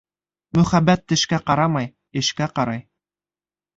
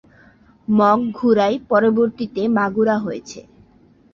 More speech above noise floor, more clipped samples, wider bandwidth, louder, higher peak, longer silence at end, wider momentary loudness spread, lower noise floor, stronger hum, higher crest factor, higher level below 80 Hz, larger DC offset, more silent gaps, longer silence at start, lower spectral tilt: first, over 71 dB vs 35 dB; neither; about the same, 7.8 kHz vs 7.2 kHz; about the same, -20 LUFS vs -18 LUFS; about the same, -4 dBFS vs -2 dBFS; first, 0.95 s vs 0.75 s; second, 9 LU vs 16 LU; first, under -90 dBFS vs -52 dBFS; neither; about the same, 18 dB vs 16 dB; first, -50 dBFS vs -58 dBFS; neither; neither; second, 0.55 s vs 0.7 s; second, -5 dB/octave vs -7 dB/octave